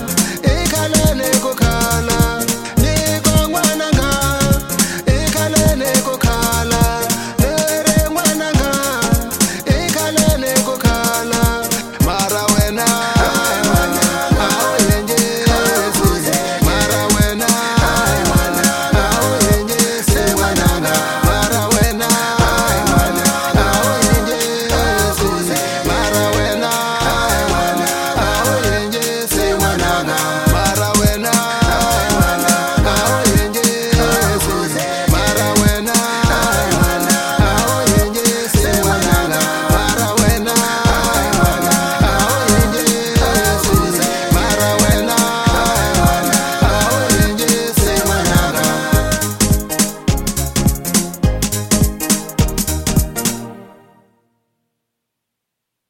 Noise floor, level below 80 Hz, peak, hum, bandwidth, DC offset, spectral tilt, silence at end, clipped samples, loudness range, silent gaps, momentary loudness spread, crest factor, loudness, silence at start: -78 dBFS; -24 dBFS; 0 dBFS; none; 17 kHz; under 0.1%; -4 dB/octave; 2.2 s; under 0.1%; 2 LU; none; 3 LU; 14 dB; -14 LUFS; 0 s